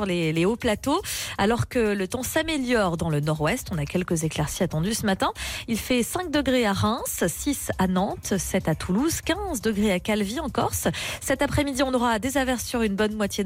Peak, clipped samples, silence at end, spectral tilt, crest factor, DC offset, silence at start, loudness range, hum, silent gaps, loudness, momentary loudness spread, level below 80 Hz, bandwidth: -12 dBFS; under 0.1%; 0 s; -4.5 dB/octave; 12 dB; under 0.1%; 0 s; 1 LU; none; none; -25 LUFS; 4 LU; -42 dBFS; 16.5 kHz